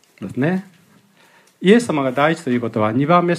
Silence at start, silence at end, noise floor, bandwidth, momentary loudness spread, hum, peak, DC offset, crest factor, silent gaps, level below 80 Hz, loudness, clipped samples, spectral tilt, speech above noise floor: 0.2 s; 0 s; -53 dBFS; 13.5 kHz; 7 LU; none; 0 dBFS; under 0.1%; 18 dB; none; -64 dBFS; -18 LUFS; under 0.1%; -6.5 dB/octave; 36 dB